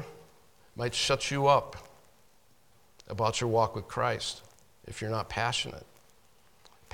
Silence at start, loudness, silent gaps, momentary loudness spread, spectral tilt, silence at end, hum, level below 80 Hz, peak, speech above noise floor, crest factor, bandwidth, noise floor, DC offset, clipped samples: 0 s; -30 LUFS; none; 20 LU; -4 dB/octave; 1.1 s; none; -58 dBFS; -10 dBFS; 35 dB; 22 dB; 18 kHz; -65 dBFS; under 0.1%; under 0.1%